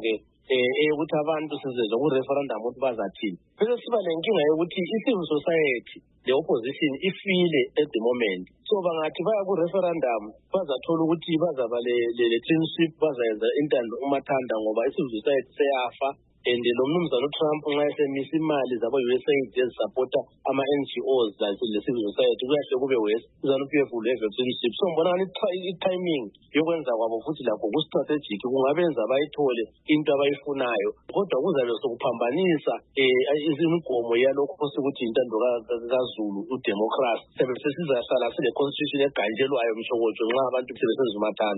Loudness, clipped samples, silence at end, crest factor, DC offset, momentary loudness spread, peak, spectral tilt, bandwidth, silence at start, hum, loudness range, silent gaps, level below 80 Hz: -25 LUFS; under 0.1%; 0 s; 14 dB; under 0.1%; 5 LU; -10 dBFS; -10 dB/octave; 4.1 kHz; 0 s; none; 2 LU; none; -68 dBFS